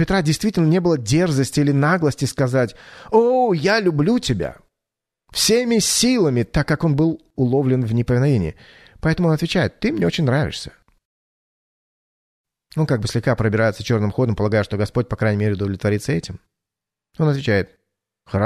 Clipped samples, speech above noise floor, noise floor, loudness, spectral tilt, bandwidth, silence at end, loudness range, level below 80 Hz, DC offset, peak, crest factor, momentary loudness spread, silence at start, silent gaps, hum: under 0.1%; 68 dB; -86 dBFS; -19 LUFS; -5.5 dB/octave; 13.5 kHz; 0 s; 5 LU; -42 dBFS; under 0.1%; -4 dBFS; 16 dB; 8 LU; 0 s; 11.05-12.44 s; none